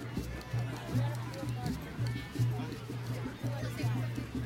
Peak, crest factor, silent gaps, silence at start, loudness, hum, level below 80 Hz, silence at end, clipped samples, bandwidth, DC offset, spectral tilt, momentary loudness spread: -20 dBFS; 16 dB; none; 0 s; -37 LUFS; none; -50 dBFS; 0 s; under 0.1%; 16 kHz; under 0.1%; -6.5 dB/octave; 5 LU